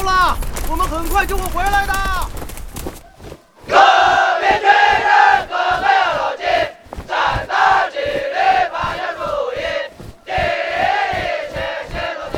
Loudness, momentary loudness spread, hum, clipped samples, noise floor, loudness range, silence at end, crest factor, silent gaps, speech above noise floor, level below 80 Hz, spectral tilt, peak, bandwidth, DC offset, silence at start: -16 LUFS; 13 LU; none; under 0.1%; -38 dBFS; 7 LU; 0 s; 16 dB; none; 23 dB; -30 dBFS; -3 dB/octave; 0 dBFS; 17.5 kHz; under 0.1%; 0 s